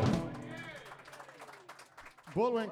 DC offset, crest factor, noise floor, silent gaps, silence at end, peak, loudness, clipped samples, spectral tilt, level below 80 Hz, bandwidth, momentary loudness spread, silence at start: under 0.1%; 18 dB; -55 dBFS; none; 0 s; -18 dBFS; -37 LUFS; under 0.1%; -7 dB/octave; -60 dBFS; 15 kHz; 20 LU; 0 s